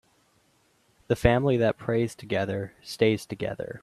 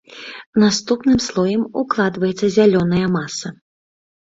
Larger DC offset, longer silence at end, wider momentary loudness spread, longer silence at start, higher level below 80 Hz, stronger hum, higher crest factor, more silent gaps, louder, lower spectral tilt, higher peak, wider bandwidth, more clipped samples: neither; second, 0.05 s vs 0.8 s; about the same, 11 LU vs 13 LU; first, 1.1 s vs 0.1 s; about the same, -46 dBFS vs -48 dBFS; neither; first, 22 dB vs 16 dB; second, none vs 0.46-0.53 s; second, -26 LUFS vs -17 LUFS; about the same, -6.5 dB/octave vs -5.5 dB/octave; about the same, -4 dBFS vs -2 dBFS; first, 14 kHz vs 8 kHz; neither